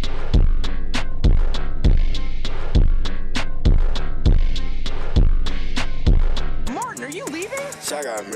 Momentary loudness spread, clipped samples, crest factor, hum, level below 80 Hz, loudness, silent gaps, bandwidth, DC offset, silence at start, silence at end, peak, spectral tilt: 7 LU; under 0.1%; 8 dB; none; -18 dBFS; -24 LUFS; none; 11 kHz; under 0.1%; 0 s; 0 s; -8 dBFS; -5 dB/octave